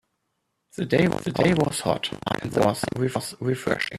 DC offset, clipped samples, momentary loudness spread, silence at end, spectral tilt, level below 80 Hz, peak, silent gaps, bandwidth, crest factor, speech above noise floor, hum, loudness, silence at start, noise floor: under 0.1%; under 0.1%; 7 LU; 0 s; -5.5 dB/octave; -54 dBFS; -4 dBFS; none; 14 kHz; 20 dB; 52 dB; none; -24 LUFS; 0.75 s; -76 dBFS